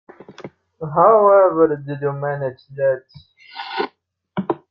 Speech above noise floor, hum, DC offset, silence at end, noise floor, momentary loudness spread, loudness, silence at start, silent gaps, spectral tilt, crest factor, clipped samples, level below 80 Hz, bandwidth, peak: 40 dB; none; under 0.1%; 0.15 s; -57 dBFS; 21 LU; -18 LUFS; 0.3 s; none; -9 dB/octave; 18 dB; under 0.1%; -62 dBFS; 5.8 kHz; -2 dBFS